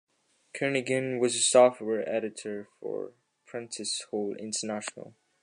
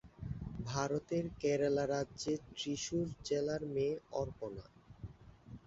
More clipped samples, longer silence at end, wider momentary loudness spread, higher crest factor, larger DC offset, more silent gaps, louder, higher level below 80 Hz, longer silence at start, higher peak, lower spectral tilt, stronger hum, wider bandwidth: neither; first, 0.35 s vs 0.1 s; about the same, 19 LU vs 18 LU; about the same, 20 dB vs 18 dB; neither; neither; first, -28 LUFS vs -38 LUFS; second, -82 dBFS vs -58 dBFS; first, 0.55 s vs 0.05 s; first, -8 dBFS vs -20 dBFS; second, -3 dB/octave vs -5.5 dB/octave; neither; first, 11 kHz vs 8 kHz